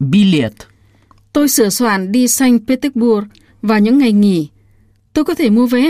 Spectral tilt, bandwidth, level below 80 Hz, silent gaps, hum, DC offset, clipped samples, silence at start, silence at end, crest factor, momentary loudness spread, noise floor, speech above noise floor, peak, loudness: -5 dB/octave; 15.5 kHz; -48 dBFS; none; none; under 0.1%; under 0.1%; 0 s; 0 s; 12 dB; 10 LU; -51 dBFS; 39 dB; 0 dBFS; -13 LUFS